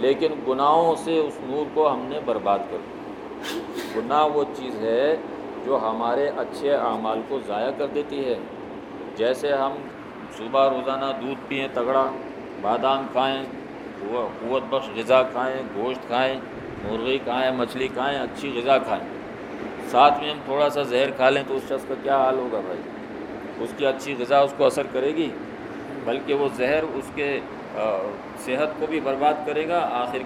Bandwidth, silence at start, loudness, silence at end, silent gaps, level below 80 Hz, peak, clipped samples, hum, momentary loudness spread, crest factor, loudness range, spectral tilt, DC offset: 15.5 kHz; 0 s; -24 LUFS; 0 s; none; -58 dBFS; -2 dBFS; under 0.1%; none; 14 LU; 22 dB; 4 LU; -5 dB/octave; under 0.1%